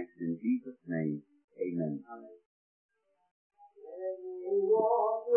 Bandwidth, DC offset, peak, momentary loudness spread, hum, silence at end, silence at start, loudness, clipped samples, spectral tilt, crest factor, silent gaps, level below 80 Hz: 2.7 kHz; under 0.1%; -16 dBFS; 19 LU; none; 0 s; 0 s; -33 LUFS; under 0.1%; -13 dB/octave; 18 dB; 1.44-1.48 s, 2.46-2.89 s, 3.31-3.50 s; under -90 dBFS